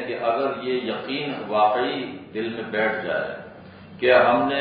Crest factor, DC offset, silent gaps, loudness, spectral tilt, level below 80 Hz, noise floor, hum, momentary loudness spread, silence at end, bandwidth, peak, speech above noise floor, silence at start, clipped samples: 20 dB; under 0.1%; none; -23 LUFS; -9.5 dB/octave; -60 dBFS; -43 dBFS; none; 14 LU; 0 s; 5 kHz; -4 dBFS; 20 dB; 0 s; under 0.1%